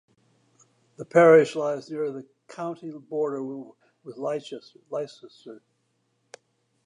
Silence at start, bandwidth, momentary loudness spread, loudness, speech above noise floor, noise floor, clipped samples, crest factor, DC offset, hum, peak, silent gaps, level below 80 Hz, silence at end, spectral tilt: 1 s; 10.5 kHz; 28 LU; -24 LUFS; 48 dB; -72 dBFS; under 0.1%; 22 dB; under 0.1%; none; -4 dBFS; none; -84 dBFS; 1.3 s; -6.5 dB/octave